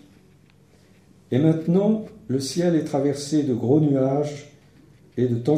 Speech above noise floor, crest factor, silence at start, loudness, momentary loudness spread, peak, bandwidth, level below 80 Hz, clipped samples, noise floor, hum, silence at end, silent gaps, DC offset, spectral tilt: 34 dB; 16 dB; 1.3 s; -22 LUFS; 8 LU; -6 dBFS; 15.5 kHz; -62 dBFS; under 0.1%; -55 dBFS; none; 0 s; none; under 0.1%; -7.5 dB/octave